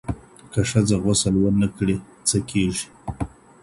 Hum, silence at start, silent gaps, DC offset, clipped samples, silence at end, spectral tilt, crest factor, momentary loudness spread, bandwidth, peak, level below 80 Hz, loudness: none; 0.05 s; none; under 0.1%; under 0.1%; 0.35 s; -5 dB/octave; 18 dB; 14 LU; 11.5 kHz; -6 dBFS; -40 dBFS; -22 LUFS